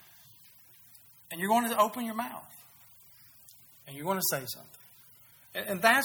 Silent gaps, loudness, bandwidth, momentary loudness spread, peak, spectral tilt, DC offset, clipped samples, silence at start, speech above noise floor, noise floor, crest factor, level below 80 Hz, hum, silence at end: none; -30 LUFS; over 20 kHz; 26 LU; -10 dBFS; -3 dB/octave; under 0.1%; under 0.1%; 1.3 s; 28 dB; -58 dBFS; 24 dB; -78 dBFS; none; 0 s